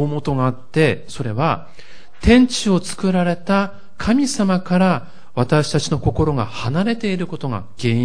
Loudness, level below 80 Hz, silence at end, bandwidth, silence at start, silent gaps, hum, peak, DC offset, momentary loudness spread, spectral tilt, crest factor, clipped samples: -19 LUFS; -36 dBFS; 0 s; 10.5 kHz; 0 s; none; none; 0 dBFS; 3%; 10 LU; -6 dB/octave; 18 dB; under 0.1%